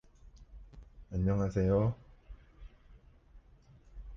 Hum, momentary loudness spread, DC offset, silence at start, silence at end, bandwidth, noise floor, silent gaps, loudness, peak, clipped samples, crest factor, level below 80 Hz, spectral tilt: none; 26 LU; under 0.1%; 0.35 s; 0 s; 7.2 kHz; -60 dBFS; none; -32 LUFS; -18 dBFS; under 0.1%; 18 dB; -48 dBFS; -9.5 dB/octave